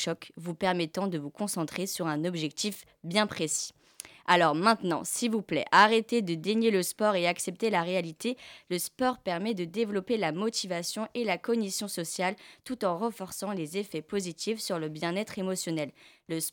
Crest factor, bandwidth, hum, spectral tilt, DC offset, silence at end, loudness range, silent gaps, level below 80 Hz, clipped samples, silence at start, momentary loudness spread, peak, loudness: 24 dB; 19 kHz; none; -4 dB/octave; under 0.1%; 0 s; 7 LU; none; -72 dBFS; under 0.1%; 0 s; 11 LU; -6 dBFS; -30 LUFS